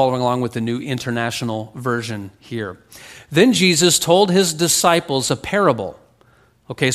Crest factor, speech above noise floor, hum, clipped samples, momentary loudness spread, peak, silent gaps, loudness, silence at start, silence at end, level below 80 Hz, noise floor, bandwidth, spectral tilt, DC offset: 18 dB; 36 dB; none; under 0.1%; 15 LU; 0 dBFS; none; -17 LUFS; 0 s; 0 s; -54 dBFS; -54 dBFS; 15.5 kHz; -3.5 dB/octave; under 0.1%